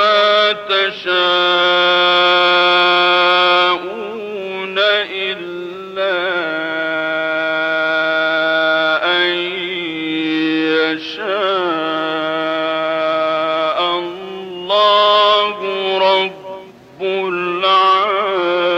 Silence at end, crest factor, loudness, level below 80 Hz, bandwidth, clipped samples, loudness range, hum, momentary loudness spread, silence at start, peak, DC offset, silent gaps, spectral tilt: 0 s; 12 dB; -15 LUFS; -64 dBFS; 8.8 kHz; under 0.1%; 6 LU; none; 11 LU; 0 s; -4 dBFS; under 0.1%; none; -4 dB/octave